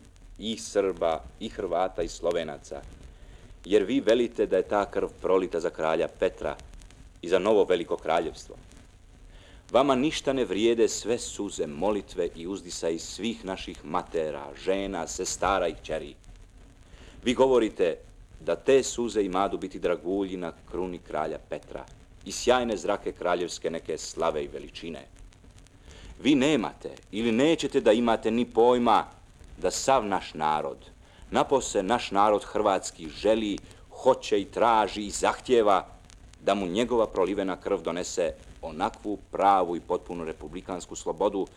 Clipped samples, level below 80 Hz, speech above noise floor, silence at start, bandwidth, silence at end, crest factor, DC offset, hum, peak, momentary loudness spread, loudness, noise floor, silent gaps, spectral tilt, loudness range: under 0.1%; -50 dBFS; 25 dB; 0.2 s; 13.5 kHz; 0.1 s; 20 dB; under 0.1%; none; -8 dBFS; 14 LU; -27 LUFS; -52 dBFS; none; -4 dB/octave; 6 LU